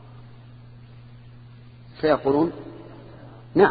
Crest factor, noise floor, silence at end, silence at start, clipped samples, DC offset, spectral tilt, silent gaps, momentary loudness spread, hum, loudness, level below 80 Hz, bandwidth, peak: 24 dB; -45 dBFS; 0 s; 0.2 s; under 0.1%; under 0.1%; -10.5 dB/octave; none; 26 LU; none; -23 LUFS; -54 dBFS; 5 kHz; -2 dBFS